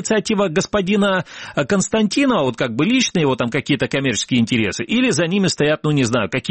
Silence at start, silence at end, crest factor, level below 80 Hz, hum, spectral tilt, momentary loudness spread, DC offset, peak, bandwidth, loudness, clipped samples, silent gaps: 0 s; 0 s; 14 dB; -50 dBFS; none; -4.5 dB/octave; 3 LU; under 0.1%; -4 dBFS; 8.8 kHz; -18 LUFS; under 0.1%; none